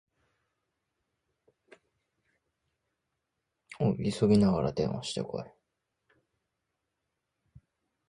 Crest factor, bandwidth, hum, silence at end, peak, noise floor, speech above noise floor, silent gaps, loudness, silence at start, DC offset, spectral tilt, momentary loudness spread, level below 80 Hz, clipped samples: 22 dB; 11 kHz; none; 2.6 s; -12 dBFS; -84 dBFS; 56 dB; none; -29 LUFS; 3.7 s; under 0.1%; -7 dB/octave; 15 LU; -58 dBFS; under 0.1%